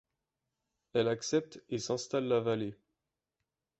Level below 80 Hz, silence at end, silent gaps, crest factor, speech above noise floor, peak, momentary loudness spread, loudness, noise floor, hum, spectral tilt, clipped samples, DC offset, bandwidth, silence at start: -72 dBFS; 1.05 s; none; 18 dB; 56 dB; -18 dBFS; 8 LU; -34 LUFS; -88 dBFS; none; -5 dB/octave; under 0.1%; under 0.1%; 8.2 kHz; 0.95 s